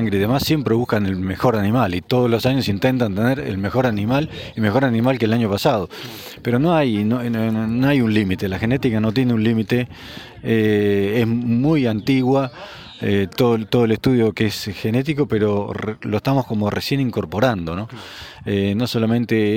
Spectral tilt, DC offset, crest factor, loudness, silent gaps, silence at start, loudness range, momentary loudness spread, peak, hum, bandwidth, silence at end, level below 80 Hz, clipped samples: -7 dB/octave; under 0.1%; 16 dB; -19 LUFS; none; 0 s; 2 LU; 9 LU; -4 dBFS; none; 17 kHz; 0 s; -48 dBFS; under 0.1%